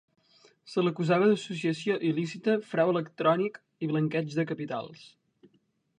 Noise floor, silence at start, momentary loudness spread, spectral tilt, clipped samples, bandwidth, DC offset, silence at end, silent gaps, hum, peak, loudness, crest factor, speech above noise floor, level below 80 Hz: -70 dBFS; 0.65 s; 10 LU; -7 dB/octave; under 0.1%; 10 kHz; under 0.1%; 0.9 s; none; none; -10 dBFS; -29 LUFS; 18 dB; 42 dB; -76 dBFS